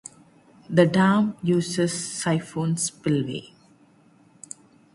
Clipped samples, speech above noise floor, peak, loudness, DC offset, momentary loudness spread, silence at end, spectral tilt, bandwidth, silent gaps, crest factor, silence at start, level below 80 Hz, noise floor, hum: under 0.1%; 34 dB; -4 dBFS; -23 LUFS; under 0.1%; 22 LU; 1.5 s; -5.5 dB/octave; 11.5 kHz; none; 22 dB; 0.7 s; -64 dBFS; -57 dBFS; none